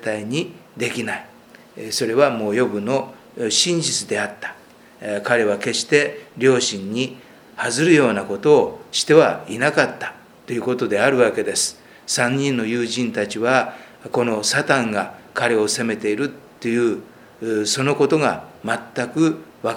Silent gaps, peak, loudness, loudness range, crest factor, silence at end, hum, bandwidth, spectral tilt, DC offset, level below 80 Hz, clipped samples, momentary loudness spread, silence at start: none; 0 dBFS; -20 LUFS; 4 LU; 20 dB; 0 s; none; 17 kHz; -3.5 dB/octave; under 0.1%; -66 dBFS; under 0.1%; 12 LU; 0 s